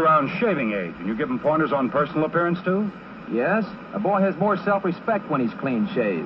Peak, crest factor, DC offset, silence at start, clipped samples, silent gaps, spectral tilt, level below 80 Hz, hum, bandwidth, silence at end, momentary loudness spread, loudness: -8 dBFS; 14 dB; under 0.1%; 0 s; under 0.1%; none; -9.5 dB/octave; -58 dBFS; none; 6 kHz; 0 s; 6 LU; -23 LUFS